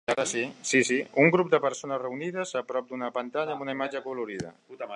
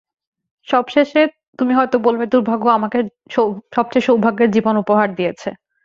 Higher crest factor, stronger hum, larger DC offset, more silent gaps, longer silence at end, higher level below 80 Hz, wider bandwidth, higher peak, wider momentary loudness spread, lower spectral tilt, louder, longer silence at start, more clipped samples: first, 22 dB vs 16 dB; neither; neither; second, none vs 1.48-1.53 s; second, 0 s vs 0.3 s; second, -72 dBFS vs -60 dBFS; first, 11 kHz vs 7.4 kHz; second, -6 dBFS vs 0 dBFS; first, 12 LU vs 7 LU; second, -4 dB/octave vs -6.5 dB/octave; second, -27 LUFS vs -17 LUFS; second, 0.1 s vs 0.7 s; neither